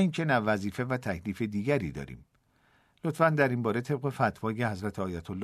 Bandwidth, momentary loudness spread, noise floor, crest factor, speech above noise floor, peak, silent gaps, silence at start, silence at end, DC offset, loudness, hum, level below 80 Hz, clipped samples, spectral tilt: 13.5 kHz; 10 LU; -67 dBFS; 20 dB; 38 dB; -10 dBFS; none; 0 s; 0 s; under 0.1%; -30 LUFS; none; -58 dBFS; under 0.1%; -7 dB/octave